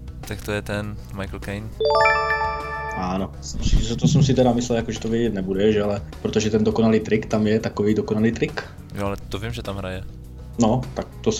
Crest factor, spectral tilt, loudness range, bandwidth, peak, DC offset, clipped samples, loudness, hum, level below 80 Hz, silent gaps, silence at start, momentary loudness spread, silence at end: 16 dB; -6 dB/octave; 4 LU; 15.5 kHz; -4 dBFS; under 0.1%; under 0.1%; -22 LUFS; none; -34 dBFS; none; 0 s; 14 LU; 0 s